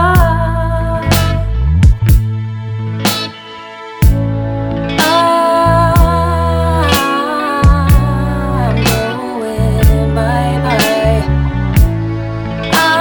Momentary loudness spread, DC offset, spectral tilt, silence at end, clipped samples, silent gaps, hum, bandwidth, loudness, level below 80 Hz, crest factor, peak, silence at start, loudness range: 9 LU; under 0.1%; -5.5 dB/octave; 0 s; under 0.1%; none; none; over 20 kHz; -13 LUFS; -18 dBFS; 12 dB; 0 dBFS; 0 s; 3 LU